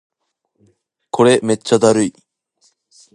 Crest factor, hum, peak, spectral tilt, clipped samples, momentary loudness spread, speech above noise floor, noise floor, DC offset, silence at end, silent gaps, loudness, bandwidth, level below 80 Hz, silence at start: 18 dB; none; 0 dBFS; -5 dB/octave; under 0.1%; 9 LU; 58 dB; -72 dBFS; under 0.1%; 1.05 s; none; -15 LUFS; 11.5 kHz; -62 dBFS; 1.15 s